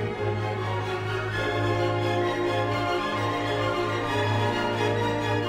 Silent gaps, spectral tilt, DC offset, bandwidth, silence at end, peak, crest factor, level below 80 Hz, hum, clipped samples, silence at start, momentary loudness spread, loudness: none; -6 dB/octave; under 0.1%; 13.5 kHz; 0 s; -12 dBFS; 14 dB; -50 dBFS; none; under 0.1%; 0 s; 4 LU; -26 LUFS